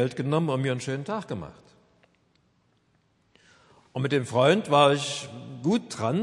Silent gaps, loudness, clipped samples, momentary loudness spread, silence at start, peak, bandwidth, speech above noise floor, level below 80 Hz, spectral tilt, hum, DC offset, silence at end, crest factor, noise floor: none; -25 LUFS; under 0.1%; 17 LU; 0 s; -6 dBFS; 11.5 kHz; 42 dB; -68 dBFS; -5.5 dB/octave; none; under 0.1%; 0 s; 22 dB; -67 dBFS